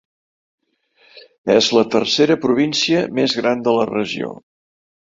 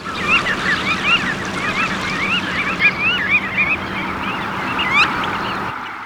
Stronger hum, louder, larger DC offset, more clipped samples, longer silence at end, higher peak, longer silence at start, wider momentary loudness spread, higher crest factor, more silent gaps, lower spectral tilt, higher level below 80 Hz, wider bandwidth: neither; about the same, -17 LUFS vs -17 LUFS; neither; neither; first, 0.7 s vs 0 s; about the same, -2 dBFS vs -2 dBFS; first, 1.15 s vs 0 s; about the same, 9 LU vs 8 LU; about the same, 18 dB vs 18 dB; first, 1.38-1.44 s vs none; about the same, -4 dB/octave vs -3.5 dB/octave; second, -60 dBFS vs -44 dBFS; second, 7.8 kHz vs over 20 kHz